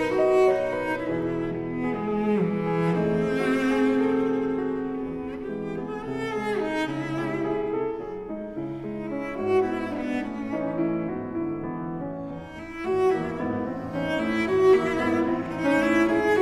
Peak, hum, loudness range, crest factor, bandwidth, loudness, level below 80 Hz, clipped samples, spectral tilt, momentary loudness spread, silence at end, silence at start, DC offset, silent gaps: -8 dBFS; none; 5 LU; 16 dB; 12 kHz; -26 LUFS; -52 dBFS; under 0.1%; -7 dB/octave; 11 LU; 0 s; 0 s; under 0.1%; none